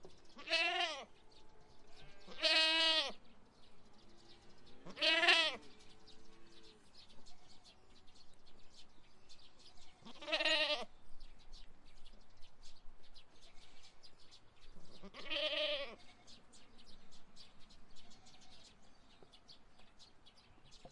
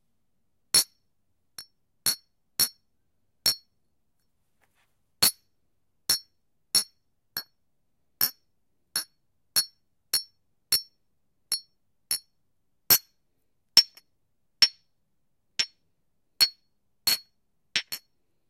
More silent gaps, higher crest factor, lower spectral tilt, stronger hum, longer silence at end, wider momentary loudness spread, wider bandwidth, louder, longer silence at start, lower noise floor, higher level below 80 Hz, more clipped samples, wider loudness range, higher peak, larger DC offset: neither; about the same, 28 dB vs 28 dB; first, -1 dB/octave vs 1.5 dB/octave; neither; second, 0 s vs 0.5 s; first, 30 LU vs 16 LU; second, 11.5 kHz vs 16 kHz; second, -34 LUFS vs -25 LUFS; second, 0 s vs 0.75 s; second, -62 dBFS vs -79 dBFS; first, -64 dBFS vs -70 dBFS; neither; first, 11 LU vs 6 LU; second, -14 dBFS vs -4 dBFS; neither